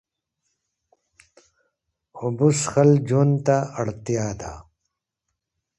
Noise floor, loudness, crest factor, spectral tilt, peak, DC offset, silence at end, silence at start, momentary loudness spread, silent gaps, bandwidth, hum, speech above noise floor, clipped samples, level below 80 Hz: -81 dBFS; -21 LUFS; 18 dB; -6.5 dB/octave; -6 dBFS; under 0.1%; 1.15 s; 2.15 s; 13 LU; none; 11.5 kHz; none; 60 dB; under 0.1%; -54 dBFS